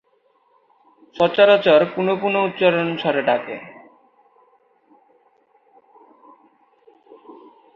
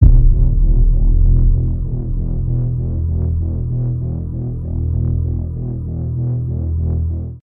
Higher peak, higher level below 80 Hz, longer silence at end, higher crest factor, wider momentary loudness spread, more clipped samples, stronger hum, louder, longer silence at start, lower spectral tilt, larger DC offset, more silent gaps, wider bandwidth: about the same, -2 dBFS vs 0 dBFS; second, -68 dBFS vs -16 dBFS; first, 0.45 s vs 0.1 s; first, 20 dB vs 14 dB; first, 13 LU vs 8 LU; neither; neither; about the same, -17 LUFS vs -19 LUFS; first, 1.15 s vs 0 s; second, -7 dB/octave vs -14.5 dB/octave; neither; neither; first, 6 kHz vs 1.3 kHz